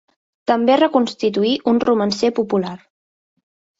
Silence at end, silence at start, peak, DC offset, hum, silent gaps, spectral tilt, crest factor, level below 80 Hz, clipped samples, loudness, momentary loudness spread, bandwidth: 1.05 s; 0.5 s; -2 dBFS; under 0.1%; none; none; -5.5 dB/octave; 16 dB; -60 dBFS; under 0.1%; -18 LUFS; 10 LU; 8 kHz